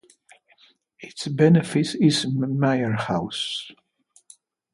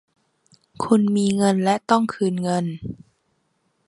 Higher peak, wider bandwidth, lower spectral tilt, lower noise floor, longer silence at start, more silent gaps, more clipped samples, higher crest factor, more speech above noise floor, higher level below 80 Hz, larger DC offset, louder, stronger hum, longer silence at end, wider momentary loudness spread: about the same, -4 dBFS vs -2 dBFS; about the same, 11.5 kHz vs 11.5 kHz; about the same, -6 dB/octave vs -6 dB/octave; second, -61 dBFS vs -69 dBFS; first, 1 s vs 0.8 s; neither; neither; about the same, 20 dB vs 20 dB; second, 40 dB vs 49 dB; about the same, -62 dBFS vs -58 dBFS; neither; about the same, -22 LUFS vs -21 LUFS; neither; about the same, 1.05 s vs 0.95 s; about the same, 16 LU vs 15 LU